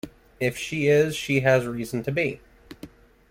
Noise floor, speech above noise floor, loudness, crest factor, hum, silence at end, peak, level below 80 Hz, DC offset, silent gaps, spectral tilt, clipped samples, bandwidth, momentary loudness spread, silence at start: -47 dBFS; 23 dB; -24 LUFS; 18 dB; none; 0.45 s; -6 dBFS; -54 dBFS; under 0.1%; none; -5.5 dB/octave; under 0.1%; 16.5 kHz; 23 LU; 0.05 s